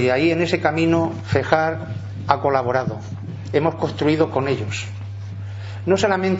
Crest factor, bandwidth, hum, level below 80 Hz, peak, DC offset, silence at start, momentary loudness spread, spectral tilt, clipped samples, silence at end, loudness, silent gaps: 20 dB; 8 kHz; none; -52 dBFS; 0 dBFS; under 0.1%; 0 s; 13 LU; -6.5 dB/octave; under 0.1%; 0 s; -20 LUFS; none